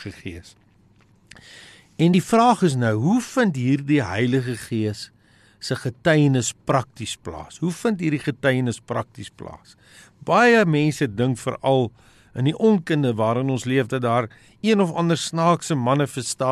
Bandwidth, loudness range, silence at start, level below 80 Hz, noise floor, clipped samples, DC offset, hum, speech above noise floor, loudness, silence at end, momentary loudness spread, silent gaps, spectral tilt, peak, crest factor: 13 kHz; 4 LU; 0 s; -58 dBFS; -56 dBFS; under 0.1%; under 0.1%; none; 35 dB; -21 LUFS; 0 s; 17 LU; none; -6 dB/octave; -6 dBFS; 16 dB